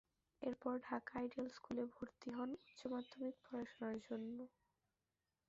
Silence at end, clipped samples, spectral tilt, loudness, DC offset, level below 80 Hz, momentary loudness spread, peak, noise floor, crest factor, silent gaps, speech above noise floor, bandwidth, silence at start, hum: 1 s; under 0.1%; -4.5 dB/octave; -48 LUFS; under 0.1%; -80 dBFS; 6 LU; -30 dBFS; under -90 dBFS; 20 dB; none; over 43 dB; 7.6 kHz; 0.4 s; none